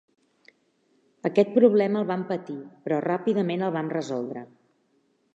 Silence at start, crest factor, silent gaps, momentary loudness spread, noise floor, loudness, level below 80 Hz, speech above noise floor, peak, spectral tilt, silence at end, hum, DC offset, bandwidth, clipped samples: 1.25 s; 20 dB; none; 15 LU; -68 dBFS; -25 LUFS; -80 dBFS; 44 dB; -6 dBFS; -7.5 dB/octave; 0.9 s; none; under 0.1%; 7.8 kHz; under 0.1%